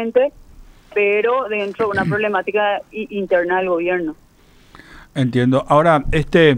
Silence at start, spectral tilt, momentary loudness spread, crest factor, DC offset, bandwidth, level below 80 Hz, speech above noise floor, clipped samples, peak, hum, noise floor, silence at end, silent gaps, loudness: 0 s; -7 dB/octave; 10 LU; 16 dB; under 0.1%; 11 kHz; -36 dBFS; 33 dB; under 0.1%; -2 dBFS; none; -49 dBFS; 0 s; none; -18 LUFS